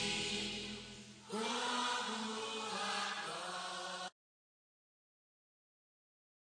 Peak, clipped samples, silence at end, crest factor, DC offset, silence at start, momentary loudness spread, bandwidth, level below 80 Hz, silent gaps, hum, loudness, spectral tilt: -26 dBFS; under 0.1%; 2.4 s; 16 dB; under 0.1%; 0 s; 10 LU; 10.5 kHz; -72 dBFS; none; none; -40 LUFS; -2 dB/octave